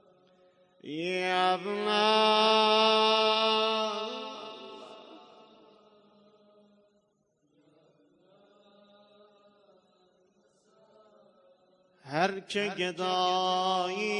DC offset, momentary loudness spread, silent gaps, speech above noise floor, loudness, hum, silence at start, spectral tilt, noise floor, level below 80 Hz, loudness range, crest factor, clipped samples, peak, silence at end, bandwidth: under 0.1%; 21 LU; none; 45 dB; -27 LUFS; none; 0.85 s; -3.5 dB/octave; -73 dBFS; -84 dBFS; 17 LU; 20 dB; under 0.1%; -12 dBFS; 0 s; 10.5 kHz